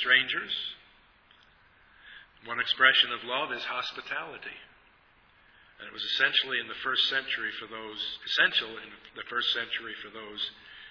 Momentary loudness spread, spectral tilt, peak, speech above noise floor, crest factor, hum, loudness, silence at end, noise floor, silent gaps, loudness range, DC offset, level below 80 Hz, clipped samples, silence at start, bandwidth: 20 LU; -2 dB/octave; -6 dBFS; 31 dB; 26 dB; none; -28 LUFS; 0 s; -62 dBFS; none; 4 LU; under 0.1%; -70 dBFS; under 0.1%; 0 s; 5.4 kHz